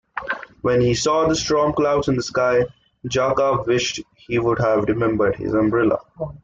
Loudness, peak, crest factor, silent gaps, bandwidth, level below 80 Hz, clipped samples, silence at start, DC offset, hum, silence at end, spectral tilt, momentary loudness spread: -20 LUFS; -6 dBFS; 14 dB; none; 8.4 kHz; -46 dBFS; under 0.1%; 0.15 s; under 0.1%; none; 0.05 s; -5 dB/octave; 9 LU